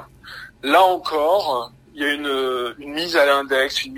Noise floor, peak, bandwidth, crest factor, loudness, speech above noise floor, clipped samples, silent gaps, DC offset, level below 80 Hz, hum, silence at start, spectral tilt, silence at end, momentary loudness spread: -40 dBFS; -2 dBFS; 16 kHz; 18 dB; -19 LUFS; 20 dB; under 0.1%; none; under 0.1%; -56 dBFS; none; 0 s; -2.5 dB/octave; 0 s; 17 LU